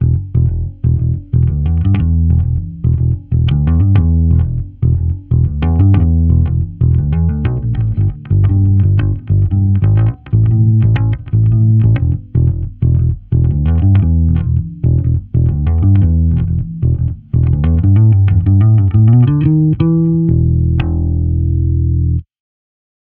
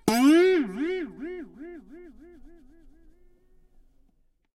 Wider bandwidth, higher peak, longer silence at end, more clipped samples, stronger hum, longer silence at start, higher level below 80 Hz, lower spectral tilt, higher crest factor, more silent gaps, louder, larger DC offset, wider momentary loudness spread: second, 3.6 kHz vs 16 kHz; first, 0 dBFS vs -6 dBFS; second, 0.9 s vs 2.45 s; neither; neither; about the same, 0 s vs 0.05 s; first, -20 dBFS vs -56 dBFS; first, -13 dB/octave vs -4.5 dB/octave; second, 12 dB vs 22 dB; neither; first, -13 LUFS vs -23 LUFS; neither; second, 6 LU vs 25 LU